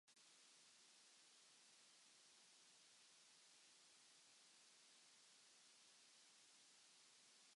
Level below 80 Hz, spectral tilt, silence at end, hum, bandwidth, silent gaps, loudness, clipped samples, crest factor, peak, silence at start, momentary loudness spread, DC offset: under -90 dBFS; 1 dB/octave; 0 s; none; 11.5 kHz; none; -69 LUFS; under 0.1%; 12 dB; -58 dBFS; 0.05 s; 0 LU; under 0.1%